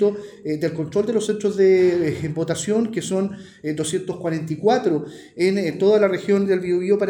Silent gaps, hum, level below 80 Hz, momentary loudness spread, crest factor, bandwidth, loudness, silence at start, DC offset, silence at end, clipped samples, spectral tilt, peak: none; none; -62 dBFS; 9 LU; 14 dB; 12.5 kHz; -21 LUFS; 0 s; under 0.1%; 0 s; under 0.1%; -6 dB/octave; -6 dBFS